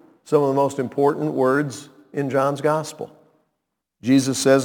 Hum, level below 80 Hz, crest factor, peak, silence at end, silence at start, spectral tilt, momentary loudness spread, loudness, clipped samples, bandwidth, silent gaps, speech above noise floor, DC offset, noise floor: none; -68 dBFS; 16 dB; -4 dBFS; 0 s; 0.3 s; -5.5 dB/octave; 15 LU; -21 LUFS; under 0.1%; 18.5 kHz; none; 59 dB; under 0.1%; -78 dBFS